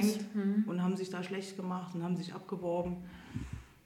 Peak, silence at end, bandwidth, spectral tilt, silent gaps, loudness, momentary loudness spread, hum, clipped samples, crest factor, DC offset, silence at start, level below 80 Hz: -18 dBFS; 0.15 s; 16 kHz; -6.5 dB/octave; none; -37 LUFS; 12 LU; none; under 0.1%; 18 dB; under 0.1%; 0 s; -58 dBFS